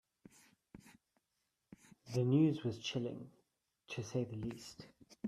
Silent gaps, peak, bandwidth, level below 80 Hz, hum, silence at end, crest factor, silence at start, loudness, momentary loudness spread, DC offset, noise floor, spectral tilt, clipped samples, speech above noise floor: none; -20 dBFS; 13.5 kHz; -72 dBFS; none; 0 s; 20 dB; 0.75 s; -38 LUFS; 25 LU; under 0.1%; -86 dBFS; -6.5 dB/octave; under 0.1%; 49 dB